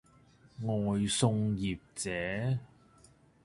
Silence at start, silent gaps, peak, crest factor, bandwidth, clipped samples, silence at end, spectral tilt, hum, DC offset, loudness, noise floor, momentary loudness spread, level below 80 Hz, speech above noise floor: 0.6 s; none; -14 dBFS; 20 dB; 11.5 kHz; under 0.1%; 0.8 s; -5 dB/octave; none; under 0.1%; -33 LUFS; -62 dBFS; 9 LU; -58 dBFS; 30 dB